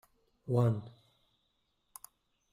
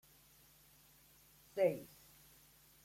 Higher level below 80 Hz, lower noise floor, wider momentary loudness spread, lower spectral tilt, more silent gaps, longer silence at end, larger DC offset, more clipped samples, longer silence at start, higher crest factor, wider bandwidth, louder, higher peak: first, -70 dBFS vs -78 dBFS; first, -78 dBFS vs -66 dBFS; second, 24 LU vs 27 LU; first, -8.5 dB/octave vs -5.5 dB/octave; neither; first, 1.6 s vs 1 s; neither; neither; second, 0.45 s vs 1.55 s; about the same, 20 dB vs 22 dB; about the same, 15.5 kHz vs 16.5 kHz; first, -33 LUFS vs -38 LUFS; first, -18 dBFS vs -22 dBFS